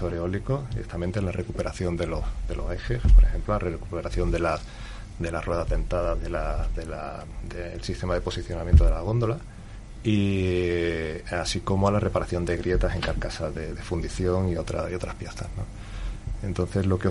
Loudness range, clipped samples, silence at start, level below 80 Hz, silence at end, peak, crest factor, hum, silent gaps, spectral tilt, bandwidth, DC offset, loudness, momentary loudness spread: 5 LU; under 0.1%; 0 s; -28 dBFS; 0 s; -4 dBFS; 20 dB; none; none; -6.5 dB/octave; 11.5 kHz; under 0.1%; -27 LUFS; 13 LU